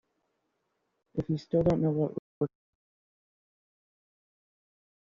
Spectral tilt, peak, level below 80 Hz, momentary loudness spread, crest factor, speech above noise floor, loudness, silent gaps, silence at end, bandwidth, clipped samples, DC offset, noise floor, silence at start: -9.5 dB/octave; -14 dBFS; -56 dBFS; 10 LU; 20 dB; 51 dB; -31 LUFS; 2.19-2.41 s; 2.7 s; 7.2 kHz; under 0.1%; under 0.1%; -79 dBFS; 1.15 s